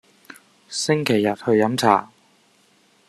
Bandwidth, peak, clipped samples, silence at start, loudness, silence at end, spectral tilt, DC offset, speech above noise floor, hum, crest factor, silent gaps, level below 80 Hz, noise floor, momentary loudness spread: 13.5 kHz; -2 dBFS; under 0.1%; 0.7 s; -20 LUFS; 1.05 s; -4.5 dB/octave; under 0.1%; 39 dB; none; 22 dB; none; -66 dBFS; -59 dBFS; 6 LU